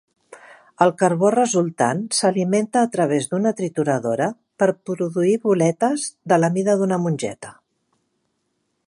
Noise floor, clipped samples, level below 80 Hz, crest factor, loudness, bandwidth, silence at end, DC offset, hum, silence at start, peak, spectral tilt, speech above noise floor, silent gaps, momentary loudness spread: -72 dBFS; under 0.1%; -70 dBFS; 20 dB; -20 LUFS; 11.5 kHz; 1.35 s; under 0.1%; none; 0.3 s; -2 dBFS; -5.5 dB/octave; 53 dB; none; 7 LU